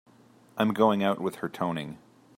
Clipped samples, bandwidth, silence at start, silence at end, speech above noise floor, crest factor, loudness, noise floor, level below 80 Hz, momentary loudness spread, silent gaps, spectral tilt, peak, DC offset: under 0.1%; 16 kHz; 0.55 s; 0.4 s; 31 dB; 20 dB; -27 LUFS; -57 dBFS; -70 dBFS; 15 LU; none; -6.5 dB/octave; -8 dBFS; under 0.1%